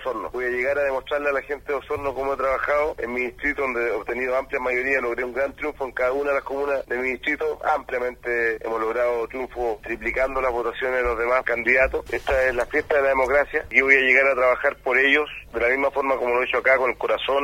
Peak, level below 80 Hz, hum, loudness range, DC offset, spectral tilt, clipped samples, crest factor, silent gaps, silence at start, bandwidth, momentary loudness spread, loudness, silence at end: -2 dBFS; -44 dBFS; none; 6 LU; under 0.1%; -4.5 dB/octave; under 0.1%; 22 dB; none; 0 s; 16.5 kHz; 9 LU; -22 LUFS; 0 s